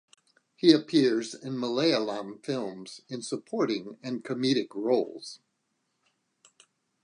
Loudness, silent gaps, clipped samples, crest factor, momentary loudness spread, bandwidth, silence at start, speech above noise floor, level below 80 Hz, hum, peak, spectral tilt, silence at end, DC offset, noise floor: -28 LUFS; none; under 0.1%; 22 dB; 16 LU; 10.5 kHz; 0.65 s; 50 dB; -82 dBFS; none; -6 dBFS; -5 dB/octave; 1.65 s; under 0.1%; -78 dBFS